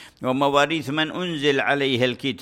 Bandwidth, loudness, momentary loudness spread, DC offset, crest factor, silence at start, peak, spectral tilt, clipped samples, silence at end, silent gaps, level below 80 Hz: 16 kHz; -21 LUFS; 5 LU; under 0.1%; 18 dB; 0 s; -4 dBFS; -5 dB/octave; under 0.1%; 0 s; none; -60 dBFS